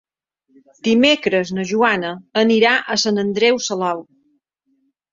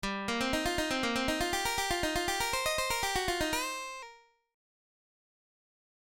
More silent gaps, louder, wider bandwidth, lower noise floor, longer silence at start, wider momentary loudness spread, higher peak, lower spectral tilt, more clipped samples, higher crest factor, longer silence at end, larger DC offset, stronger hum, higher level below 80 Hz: neither; first, -17 LUFS vs -31 LUFS; second, 7.6 kHz vs 17 kHz; first, -66 dBFS vs -56 dBFS; first, 0.85 s vs 0.05 s; first, 9 LU vs 6 LU; first, -2 dBFS vs -18 dBFS; about the same, -3.5 dB/octave vs -2.5 dB/octave; neither; about the same, 18 dB vs 16 dB; second, 1.1 s vs 1.85 s; neither; neither; second, -62 dBFS vs -50 dBFS